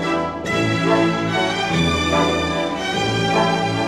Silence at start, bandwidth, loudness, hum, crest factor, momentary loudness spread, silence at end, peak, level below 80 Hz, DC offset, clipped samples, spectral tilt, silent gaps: 0 s; 13.5 kHz; -19 LUFS; none; 14 dB; 4 LU; 0 s; -4 dBFS; -40 dBFS; 0.1%; under 0.1%; -5 dB/octave; none